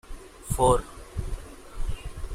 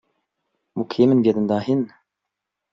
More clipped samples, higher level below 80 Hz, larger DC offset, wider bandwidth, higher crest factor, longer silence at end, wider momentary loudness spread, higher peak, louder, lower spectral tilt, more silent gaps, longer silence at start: neither; first, -34 dBFS vs -64 dBFS; neither; first, 16 kHz vs 7.4 kHz; about the same, 20 dB vs 18 dB; second, 0 s vs 0.85 s; first, 21 LU vs 15 LU; second, -8 dBFS vs -4 dBFS; second, -28 LUFS vs -20 LUFS; second, -5.5 dB/octave vs -9 dB/octave; neither; second, 0.1 s vs 0.75 s